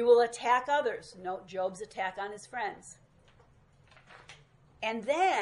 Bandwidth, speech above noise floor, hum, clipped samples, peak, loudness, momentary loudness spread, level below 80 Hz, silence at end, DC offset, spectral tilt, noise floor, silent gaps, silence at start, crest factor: 11.5 kHz; 32 dB; none; under 0.1%; -12 dBFS; -31 LUFS; 17 LU; -70 dBFS; 0 s; under 0.1%; -3 dB/octave; -62 dBFS; none; 0 s; 20 dB